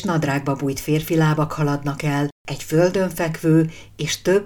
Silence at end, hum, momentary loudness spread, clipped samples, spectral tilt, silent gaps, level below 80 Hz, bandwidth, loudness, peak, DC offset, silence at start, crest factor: 0 s; none; 7 LU; under 0.1%; -6 dB/octave; 2.32-2.45 s; -46 dBFS; 19 kHz; -21 LUFS; -4 dBFS; under 0.1%; 0 s; 16 dB